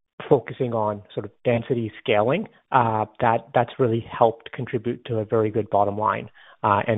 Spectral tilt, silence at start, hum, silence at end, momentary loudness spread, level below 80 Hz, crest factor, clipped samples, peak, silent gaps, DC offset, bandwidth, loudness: -5.5 dB/octave; 0.2 s; none; 0 s; 7 LU; -60 dBFS; 22 dB; under 0.1%; -2 dBFS; none; under 0.1%; 4 kHz; -23 LUFS